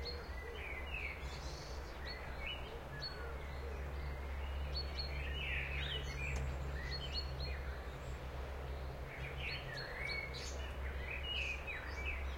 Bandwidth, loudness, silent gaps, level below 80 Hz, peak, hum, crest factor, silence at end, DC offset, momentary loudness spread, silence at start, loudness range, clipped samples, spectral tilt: 16.5 kHz; -43 LUFS; none; -46 dBFS; -28 dBFS; none; 14 dB; 0 s; under 0.1%; 7 LU; 0 s; 4 LU; under 0.1%; -4.5 dB/octave